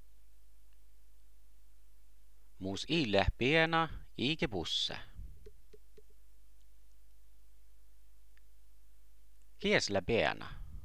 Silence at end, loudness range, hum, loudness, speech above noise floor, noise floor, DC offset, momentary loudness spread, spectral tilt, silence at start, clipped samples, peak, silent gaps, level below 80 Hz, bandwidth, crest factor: 0.05 s; 9 LU; none; -33 LUFS; 31 dB; -64 dBFS; 0.5%; 18 LU; -4.5 dB/octave; 2.6 s; under 0.1%; -12 dBFS; none; -52 dBFS; 16 kHz; 26 dB